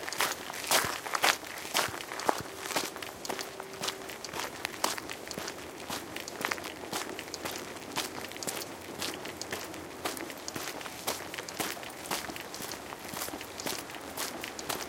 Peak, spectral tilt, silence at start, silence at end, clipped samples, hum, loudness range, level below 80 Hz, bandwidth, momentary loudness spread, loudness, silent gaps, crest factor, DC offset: -4 dBFS; -1.5 dB/octave; 0 s; 0 s; under 0.1%; none; 6 LU; -66 dBFS; 17 kHz; 10 LU; -35 LUFS; none; 32 dB; under 0.1%